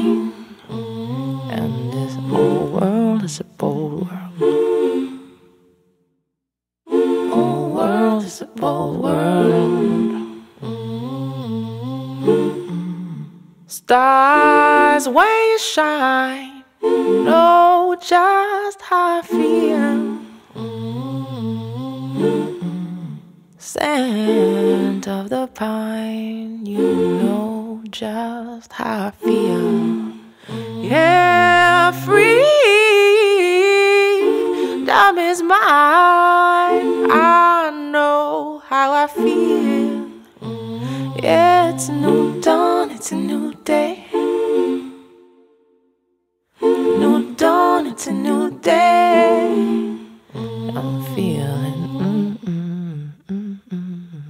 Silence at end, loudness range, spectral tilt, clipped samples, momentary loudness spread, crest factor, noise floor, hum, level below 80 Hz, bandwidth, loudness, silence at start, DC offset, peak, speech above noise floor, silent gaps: 0 s; 10 LU; -5.5 dB/octave; under 0.1%; 17 LU; 16 dB; -82 dBFS; none; -60 dBFS; 16 kHz; -16 LUFS; 0 s; under 0.1%; 0 dBFS; 67 dB; none